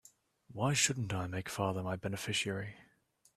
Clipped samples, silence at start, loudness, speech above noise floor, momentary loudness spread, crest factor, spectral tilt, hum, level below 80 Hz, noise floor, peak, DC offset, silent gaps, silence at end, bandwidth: under 0.1%; 0.5 s; -35 LUFS; 35 dB; 11 LU; 22 dB; -3.5 dB/octave; none; -68 dBFS; -71 dBFS; -16 dBFS; under 0.1%; none; 0.55 s; 14.5 kHz